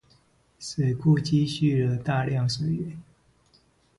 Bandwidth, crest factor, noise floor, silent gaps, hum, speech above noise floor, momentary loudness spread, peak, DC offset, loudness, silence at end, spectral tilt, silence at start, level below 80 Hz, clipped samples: 11.5 kHz; 16 dB; -63 dBFS; none; none; 38 dB; 13 LU; -10 dBFS; under 0.1%; -25 LUFS; 0.95 s; -6.5 dB/octave; 0.6 s; -56 dBFS; under 0.1%